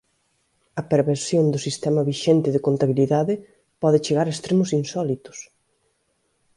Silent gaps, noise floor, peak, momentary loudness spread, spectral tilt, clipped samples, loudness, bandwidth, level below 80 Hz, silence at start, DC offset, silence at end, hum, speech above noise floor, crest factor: none; -69 dBFS; -4 dBFS; 11 LU; -6.5 dB/octave; under 0.1%; -21 LUFS; 11.5 kHz; -62 dBFS; 0.75 s; under 0.1%; 1.1 s; none; 49 dB; 18 dB